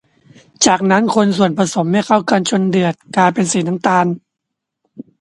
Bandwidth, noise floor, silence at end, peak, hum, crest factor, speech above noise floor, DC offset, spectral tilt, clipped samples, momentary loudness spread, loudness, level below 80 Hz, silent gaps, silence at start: 11.5 kHz; -78 dBFS; 0.2 s; 0 dBFS; none; 16 dB; 64 dB; under 0.1%; -4.5 dB/octave; under 0.1%; 4 LU; -14 LUFS; -58 dBFS; none; 0.6 s